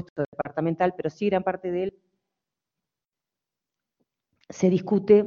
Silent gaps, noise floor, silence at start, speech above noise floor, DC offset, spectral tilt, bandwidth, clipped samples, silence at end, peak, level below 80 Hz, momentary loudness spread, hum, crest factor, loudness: 0.10-0.16 s, 0.28-0.32 s; -89 dBFS; 0 s; 65 dB; under 0.1%; -7.5 dB/octave; 7.2 kHz; under 0.1%; 0 s; -6 dBFS; -64 dBFS; 9 LU; none; 22 dB; -26 LUFS